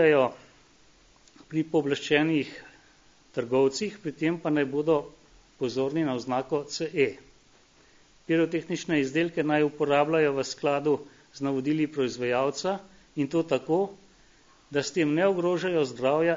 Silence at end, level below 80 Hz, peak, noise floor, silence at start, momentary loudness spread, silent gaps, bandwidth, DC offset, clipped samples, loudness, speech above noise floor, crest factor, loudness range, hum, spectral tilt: 0 s; -66 dBFS; -8 dBFS; -59 dBFS; 0 s; 9 LU; none; 7.6 kHz; under 0.1%; under 0.1%; -27 LUFS; 33 dB; 20 dB; 3 LU; none; -5.5 dB/octave